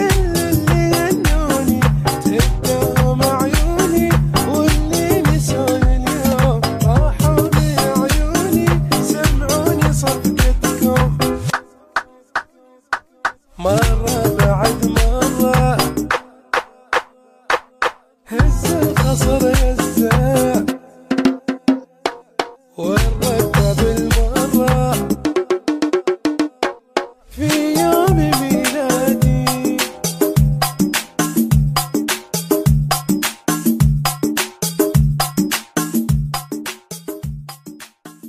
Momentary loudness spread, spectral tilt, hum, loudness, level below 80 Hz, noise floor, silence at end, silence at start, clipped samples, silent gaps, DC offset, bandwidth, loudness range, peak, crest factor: 10 LU; -5 dB/octave; none; -17 LUFS; -24 dBFS; -49 dBFS; 0 s; 0 s; under 0.1%; none; under 0.1%; 15.5 kHz; 4 LU; 0 dBFS; 16 dB